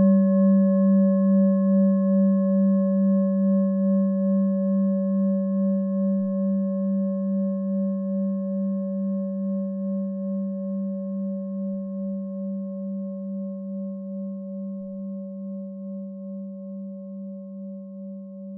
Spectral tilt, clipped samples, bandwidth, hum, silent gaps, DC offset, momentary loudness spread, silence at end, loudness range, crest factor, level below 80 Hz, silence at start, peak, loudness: -16.5 dB/octave; under 0.1%; 1.8 kHz; none; none; under 0.1%; 16 LU; 0 s; 14 LU; 12 dB; -82 dBFS; 0 s; -10 dBFS; -24 LUFS